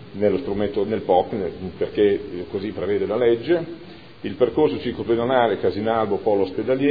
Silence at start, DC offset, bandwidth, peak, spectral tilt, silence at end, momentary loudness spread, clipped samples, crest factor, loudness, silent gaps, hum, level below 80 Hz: 0 s; 0.4%; 5 kHz; -4 dBFS; -9.5 dB/octave; 0 s; 10 LU; under 0.1%; 18 dB; -22 LUFS; none; none; -50 dBFS